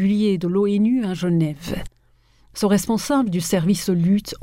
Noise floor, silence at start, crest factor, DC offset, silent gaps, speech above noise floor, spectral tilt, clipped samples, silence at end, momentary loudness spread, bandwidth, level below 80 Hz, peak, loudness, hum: -57 dBFS; 0 s; 14 dB; under 0.1%; none; 37 dB; -6 dB/octave; under 0.1%; 0 s; 8 LU; 16 kHz; -46 dBFS; -6 dBFS; -20 LUFS; none